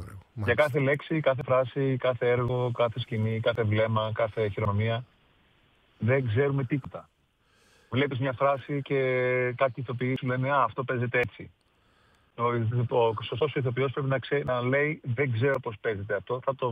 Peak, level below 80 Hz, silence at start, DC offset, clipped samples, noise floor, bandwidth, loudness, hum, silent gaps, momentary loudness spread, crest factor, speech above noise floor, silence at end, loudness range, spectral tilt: -10 dBFS; -62 dBFS; 0 s; under 0.1%; under 0.1%; -67 dBFS; 9.4 kHz; -28 LUFS; none; none; 6 LU; 18 dB; 40 dB; 0 s; 3 LU; -8.5 dB/octave